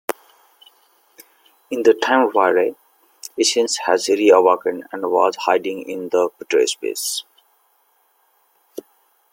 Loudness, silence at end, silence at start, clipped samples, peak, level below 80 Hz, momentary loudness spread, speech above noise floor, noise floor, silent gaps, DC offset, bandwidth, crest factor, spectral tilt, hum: -18 LUFS; 0.5 s; 0.1 s; under 0.1%; -2 dBFS; -70 dBFS; 19 LU; 44 dB; -62 dBFS; none; under 0.1%; 17 kHz; 18 dB; -2 dB/octave; none